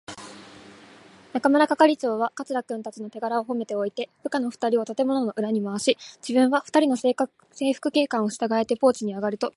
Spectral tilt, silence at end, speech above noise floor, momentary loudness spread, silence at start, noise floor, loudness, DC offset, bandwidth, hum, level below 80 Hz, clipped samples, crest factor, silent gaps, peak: -4.5 dB/octave; 0.05 s; 26 dB; 12 LU; 0.1 s; -50 dBFS; -24 LUFS; under 0.1%; 11.5 kHz; none; -72 dBFS; under 0.1%; 20 dB; none; -4 dBFS